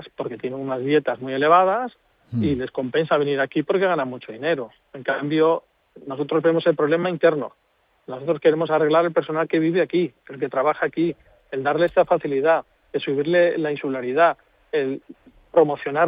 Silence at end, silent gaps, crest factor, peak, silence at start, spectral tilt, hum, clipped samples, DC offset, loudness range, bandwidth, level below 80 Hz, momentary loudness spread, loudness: 0 s; none; 18 dB; -4 dBFS; 0 s; -9.5 dB/octave; none; under 0.1%; under 0.1%; 2 LU; 5 kHz; -62 dBFS; 12 LU; -21 LUFS